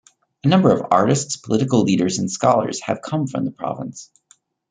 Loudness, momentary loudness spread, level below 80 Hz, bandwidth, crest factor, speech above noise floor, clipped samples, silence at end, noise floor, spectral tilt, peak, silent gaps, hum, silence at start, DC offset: -19 LUFS; 12 LU; -60 dBFS; 9.6 kHz; 18 dB; 39 dB; under 0.1%; 0.65 s; -58 dBFS; -5.5 dB/octave; -2 dBFS; none; none; 0.45 s; under 0.1%